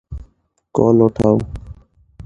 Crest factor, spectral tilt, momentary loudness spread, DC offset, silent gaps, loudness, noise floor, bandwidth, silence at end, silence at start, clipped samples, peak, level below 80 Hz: 18 dB; -10 dB/octave; 22 LU; under 0.1%; none; -15 LUFS; -57 dBFS; 9.6 kHz; 0.05 s; 0.1 s; under 0.1%; 0 dBFS; -38 dBFS